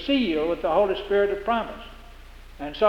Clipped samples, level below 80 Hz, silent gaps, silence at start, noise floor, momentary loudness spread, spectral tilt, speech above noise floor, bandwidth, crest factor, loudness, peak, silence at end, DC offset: under 0.1%; -44 dBFS; none; 0 s; -44 dBFS; 15 LU; -6 dB/octave; 21 dB; 13 kHz; 18 dB; -24 LUFS; -6 dBFS; 0 s; under 0.1%